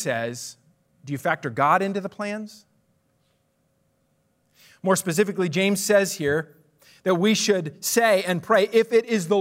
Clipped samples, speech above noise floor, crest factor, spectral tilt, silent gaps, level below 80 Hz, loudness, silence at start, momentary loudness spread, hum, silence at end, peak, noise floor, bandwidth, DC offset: under 0.1%; 46 dB; 18 dB; -4 dB/octave; none; -70 dBFS; -22 LUFS; 0 s; 12 LU; none; 0 s; -6 dBFS; -68 dBFS; 16 kHz; under 0.1%